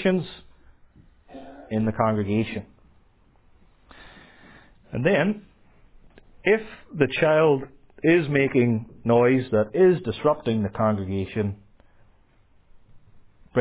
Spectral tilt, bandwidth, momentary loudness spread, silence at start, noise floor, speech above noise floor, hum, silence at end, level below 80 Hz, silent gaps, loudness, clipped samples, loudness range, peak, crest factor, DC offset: -11 dB/octave; 4 kHz; 16 LU; 0 s; -58 dBFS; 36 dB; none; 0 s; -52 dBFS; none; -23 LUFS; under 0.1%; 9 LU; -4 dBFS; 20 dB; under 0.1%